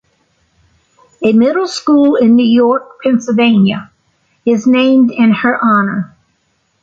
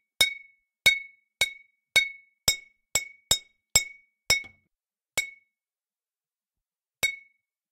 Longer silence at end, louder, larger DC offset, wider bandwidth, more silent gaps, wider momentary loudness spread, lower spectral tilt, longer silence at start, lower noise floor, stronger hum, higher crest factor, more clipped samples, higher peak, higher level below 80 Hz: first, 0.75 s vs 0.5 s; first, -11 LUFS vs -26 LUFS; neither; second, 7.8 kHz vs 16.5 kHz; neither; second, 8 LU vs 16 LU; first, -6 dB/octave vs 1 dB/octave; first, 1.2 s vs 0.2 s; second, -61 dBFS vs under -90 dBFS; neither; second, 10 dB vs 26 dB; neither; about the same, -2 dBFS vs -4 dBFS; about the same, -56 dBFS vs -54 dBFS